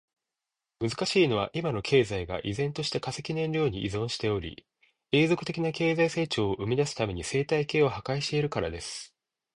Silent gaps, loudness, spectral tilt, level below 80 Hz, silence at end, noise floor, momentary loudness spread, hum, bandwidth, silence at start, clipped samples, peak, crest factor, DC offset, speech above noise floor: none; -28 LUFS; -5.5 dB/octave; -52 dBFS; 0.5 s; -88 dBFS; 9 LU; none; 11 kHz; 0.8 s; under 0.1%; -10 dBFS; 18 dB; under 0.1%; 60 dB